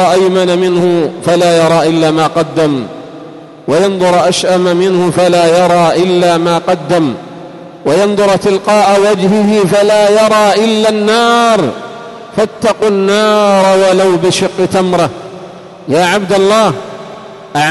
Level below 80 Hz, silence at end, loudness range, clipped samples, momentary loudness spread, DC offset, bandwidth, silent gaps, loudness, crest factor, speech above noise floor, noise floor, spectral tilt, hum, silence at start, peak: -50 dBFS; 0 s; 3 LU; under 0.1%; 17 LU; under 0.1%; 12 kHz; none; -10 LUFS; 10 dB; 21 dB; -30 dBFS; -5 dB/octave; none; 0 s; 0 dBFS